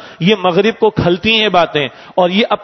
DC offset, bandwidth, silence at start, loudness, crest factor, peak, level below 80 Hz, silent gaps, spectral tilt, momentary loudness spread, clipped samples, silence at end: under 0.1%; 6.2 kHz; 0 s; -13 LUFS; 12 dB; 0 dBFS; -42 dBFS; none; -6 dB/octave; 5 LU; under 0.1%; 0 s